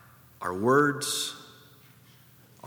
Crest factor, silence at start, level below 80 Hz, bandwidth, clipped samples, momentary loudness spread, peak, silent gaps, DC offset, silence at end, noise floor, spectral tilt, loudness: 20 dB; 0.4 s; -72 dBFS; over 20 kHz; under 0.1%; 14 LU; -10 dBFS; none; under 0.1%; 0 s; -56 dBFS; -3.5 dB/octave; -26 LUFS